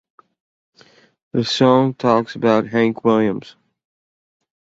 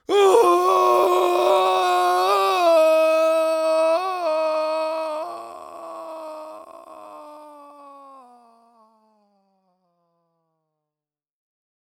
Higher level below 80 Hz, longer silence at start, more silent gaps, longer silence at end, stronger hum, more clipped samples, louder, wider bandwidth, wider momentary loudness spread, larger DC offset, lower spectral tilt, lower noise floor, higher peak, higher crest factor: first, -58 dBFS vs -78 dBFS; first, 1.35 s vs 0.1 s; neither; second, 1.15 s vs 3.9 s; neither; neither; about the same, -17 LUFS vs -19 LUFS; second, 8 kHz vs over 20 kHz; second, 8 LU vs 22 LU; neither; first, -6.5 dB/octave vs -2 dB/octave; second, -52 dBFS vs under -90 dBFS; about the same, -2 dBFS vs -2 dBFS; about the same, 18 dB vs 18 dB